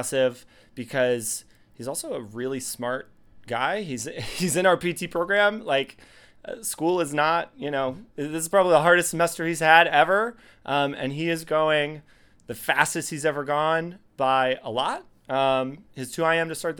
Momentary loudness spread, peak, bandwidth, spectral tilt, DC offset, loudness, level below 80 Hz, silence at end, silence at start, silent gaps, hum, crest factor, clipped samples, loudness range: 14 LU; 0 dBFS; 20 kHz; -3.5 dB/octave; under 0.1%; -24 LUFS; -60 dBFS; 0 s; 0 s; none; none; 24 dB; under 0.1%; 8 LU